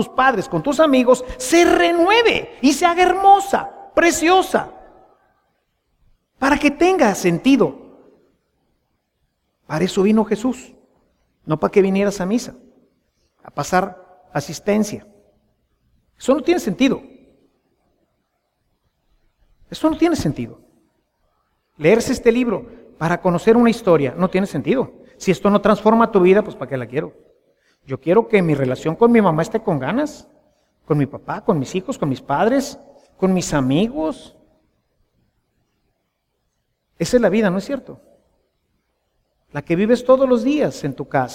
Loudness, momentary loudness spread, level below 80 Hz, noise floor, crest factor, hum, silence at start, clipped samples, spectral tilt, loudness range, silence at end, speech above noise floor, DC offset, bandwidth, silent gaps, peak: -17 LUFS; 13 LU; -48 dBFS; -71 dBFS; 18 dB; none; 0 s; under 0.1%; -5.5 dB/octave; 9 LU; 0 s; 55 dB; under 0.1%; 16.5 kHz; none; -2 dBFS